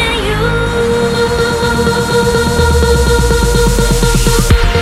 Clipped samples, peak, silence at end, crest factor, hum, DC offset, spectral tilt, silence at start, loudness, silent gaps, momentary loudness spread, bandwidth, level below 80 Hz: under 0.1%; 0 dBFS; 0 s; 10 dB; none; under 0.1%; -4.5 dB/octave; 0 s; -11 LUFS; none; 3 LU; 16.5 kHz; -16 dBFS